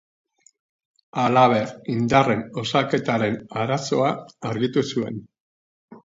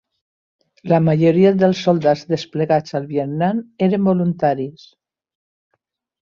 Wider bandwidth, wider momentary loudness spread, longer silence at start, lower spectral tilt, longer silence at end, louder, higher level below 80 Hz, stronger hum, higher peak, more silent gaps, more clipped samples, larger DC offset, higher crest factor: about the same, 7.8 kHz vs 7.2 kHz; about the same, 12 LU vs 10 LU; first, 1.15 s vs 0.85 s; second, -6 dB/octave vs -8 dB/octave; second, 0.05 s vs 1.5 s; second, -22 LUFS vs -17 LUFS; about the same, -58 dBFS vs -60 dBFS; neither; about the same, -2 dBFS vs -2 dBFS; first, 5.40-5.88 s vs none; neither; neither; first, 22 dB vs 16 dB